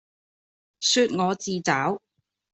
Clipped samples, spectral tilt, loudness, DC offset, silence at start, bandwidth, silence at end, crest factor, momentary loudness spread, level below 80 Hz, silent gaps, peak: under 0.1%; -3 dB/octave; -24 LUFS; under 0.1%; 0.8 s; 8.4 kHz; 0.55 s; 18 dB; 7 LU; -68 dBFS; none; -8 dBFS